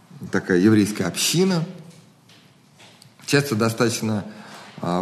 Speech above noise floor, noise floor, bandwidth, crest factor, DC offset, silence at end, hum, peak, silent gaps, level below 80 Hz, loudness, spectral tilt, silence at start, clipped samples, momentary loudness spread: 32 dB; -52 dBFS; 13 kHz; 20 dB; under 0.1%; 0 s; none; -4 dBFS; none; -64 dBFS; -21 LUFS; -4.5 dB/octave; 0.15 s; under 0.1%; 20 LU